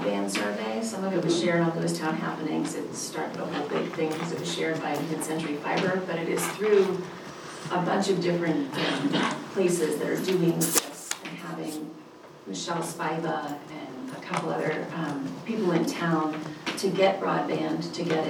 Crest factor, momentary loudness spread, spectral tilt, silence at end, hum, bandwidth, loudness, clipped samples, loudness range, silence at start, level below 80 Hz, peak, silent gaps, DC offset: 24 dB; 11 LU; -4.5 dB/octave; 0 s; none; over 20 kHz; -28 LUFS; under 0.1%; 5 LU; 0 s; -72 dBFS; -4 dBFS; none; under 0.1%